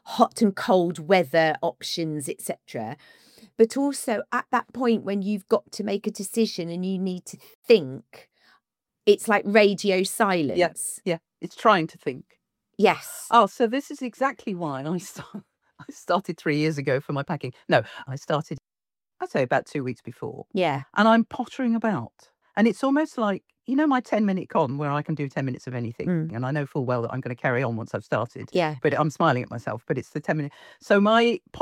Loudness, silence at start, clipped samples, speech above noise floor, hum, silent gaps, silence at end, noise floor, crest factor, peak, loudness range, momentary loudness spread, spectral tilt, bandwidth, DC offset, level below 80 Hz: -24 LUFS; 0.05 s; under 0.1%; over 66 dB; none; 7.55-7.63 s; 0 s; under -90 dBFS; 22 dB; -4 dBFS; 5 LU; 14 LU; -5.5 dB/octave; 17 kHz; under 0.1%; -70 dBFS